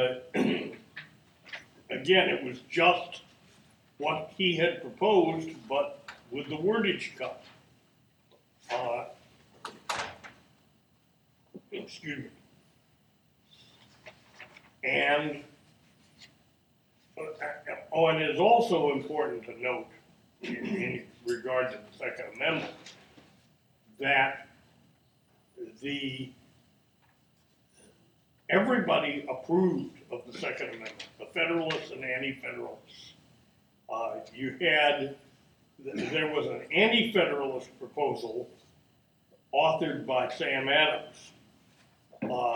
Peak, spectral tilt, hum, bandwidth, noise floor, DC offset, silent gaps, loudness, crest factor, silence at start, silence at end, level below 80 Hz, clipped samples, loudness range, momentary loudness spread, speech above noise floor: -10 dBFS; -5 dB/octave; none; over 20 kHz; -67 dBFS; under 0.1%; none; -29 LUFS; 22 dB; 0 s; 0 s; -74 dBFS; under 0.1%; 13 LU; 21 LU; 38 dB